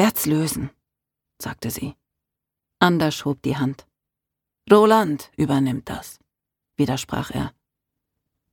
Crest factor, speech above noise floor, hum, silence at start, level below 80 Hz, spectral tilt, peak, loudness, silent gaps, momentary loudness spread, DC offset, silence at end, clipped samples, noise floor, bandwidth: 22 dB; 64 dB; none; 0 s; -50 dBFS; -5.5 dB/octave; 0 dBFS; -21 LUFS; none; 18 LU; under 0.1%; 1.05 s; under 0.1%; -85 dBFS; 19 kHz